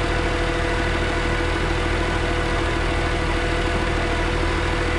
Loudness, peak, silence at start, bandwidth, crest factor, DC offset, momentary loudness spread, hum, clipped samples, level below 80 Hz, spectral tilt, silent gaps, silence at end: -22 LUFS; -8 dBFS; 0 s; 11.5 kHz; 12 dB; 0.6%; 0 LU; none; under 0.1%; -26 dBFS; -5 dB/octave; none; 0 s